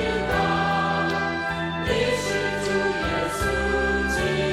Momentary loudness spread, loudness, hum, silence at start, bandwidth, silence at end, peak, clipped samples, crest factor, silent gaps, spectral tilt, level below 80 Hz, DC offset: 3 LU; -23 LUFS; none; 0 s; 16 kHz; 0 s; -10 dBFS; under 0.1%; 14 dB; none; -4.5 dB/octave; -38 dBFS; under 0.1%